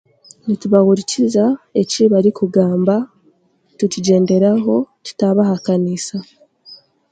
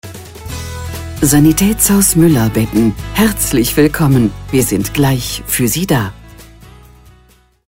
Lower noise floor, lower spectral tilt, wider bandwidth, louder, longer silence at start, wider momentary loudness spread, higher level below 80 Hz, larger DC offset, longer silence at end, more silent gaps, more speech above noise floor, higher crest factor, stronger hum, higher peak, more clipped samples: first, -57 dBFS vs -48 dBFS; first, -6.5 dB/octave vs -5 dB/octave; second, 9.2 kHz vs 16.5 kHz; second, -15 LUFS vs -12 LUFS; first, 0.45 s vs 0.05 s; second, 10 LU vs 15 LU; second, -62 dBFS vs -30 dBFS; neither; second, 0.35 s vs 1 s; neither; first, 43 dB vs 37 dB; about the same, 16 dB vs 14 dB; neither; about the same, 0 dBFS vs 0 dBFS; neither